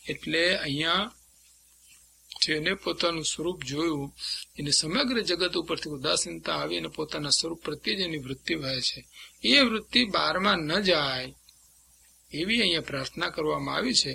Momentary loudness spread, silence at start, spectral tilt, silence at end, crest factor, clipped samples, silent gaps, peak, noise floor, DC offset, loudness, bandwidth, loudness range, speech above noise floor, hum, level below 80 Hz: 10 LU; 0.05 s; -2.5 dB/octave; 0 s; 24 dB; under 0.1%; none; -6 dBFS; -59 dBFS; under 0.1%; -26 LUFS; 16.5 kHz; 4 LU; 31 dB; none; -56 dBFS